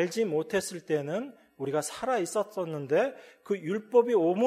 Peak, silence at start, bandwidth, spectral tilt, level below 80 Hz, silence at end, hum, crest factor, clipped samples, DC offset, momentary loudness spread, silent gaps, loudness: -10 dBFS; 0 s; 15.5 kHz; -5 dB/octave; -74 dBFS; 0 s; none; 18 dB; under 0.1%; under 0.1%; 10 LU; none; -29 LUFS